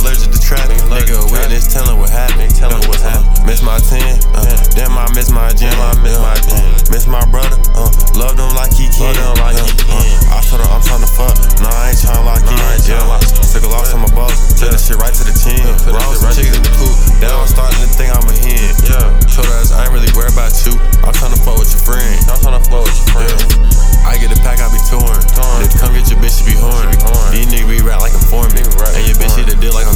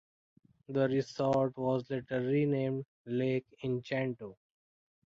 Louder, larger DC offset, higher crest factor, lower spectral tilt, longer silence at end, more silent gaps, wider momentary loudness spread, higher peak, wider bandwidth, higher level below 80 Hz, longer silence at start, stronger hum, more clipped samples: first, -12 LUFS vs -33 LUFS; first, 2% vs under 0.1%; second, 6 dB vs 16 dB; second, -4 dB/octave vs -8 dB/octave; second, 0 s vs 0.8 s; second, none vs 2.88-3.05 s; second, 2 LU vs 8 LU; first, 0 dBFS vs -18 dBFS; first, 16.5 kHz vs 7.6 kHz; first, -6 dBFS vs -70 dBFS; second, 0 s vs 0.7 s; neither; neither